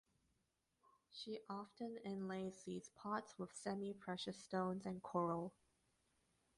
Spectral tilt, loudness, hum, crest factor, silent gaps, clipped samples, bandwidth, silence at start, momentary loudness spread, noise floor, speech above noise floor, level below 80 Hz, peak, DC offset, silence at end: -5.5 dB/octave; -47 LUFS; none; 20 dB; none; under 0.1%; 11.5 kHz; 1.1 s; 9 LU; -86 dBFS; 40 dB; -82 dBFS; -28 dBFS; under 0.1%; 1.1 s